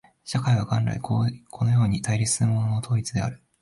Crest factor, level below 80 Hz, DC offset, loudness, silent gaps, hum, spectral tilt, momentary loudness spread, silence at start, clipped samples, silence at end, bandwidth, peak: 12 dB; -50 dBFS; under 0.1%; -25 LUFS; none; none; -5.5 dB/octave; 7 LU; 0.25 s; under 0.1%; 0.25 s; 11.5 kHz; -12 dBFS